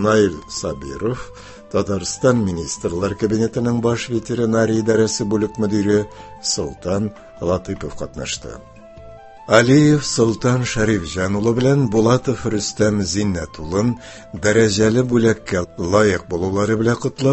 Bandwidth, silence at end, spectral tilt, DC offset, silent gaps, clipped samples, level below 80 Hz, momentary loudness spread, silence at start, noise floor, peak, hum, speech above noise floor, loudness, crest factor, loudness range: 8.6 kHz; 0 s; -5.5 dB/octave; under 0.1%; none; under 0.1%; -40 dBFS; 11 LU; 0 s; -39 dBFS; 0 dBFS; none; 21 dB; -18 LUFS; 18 dB; 5 LU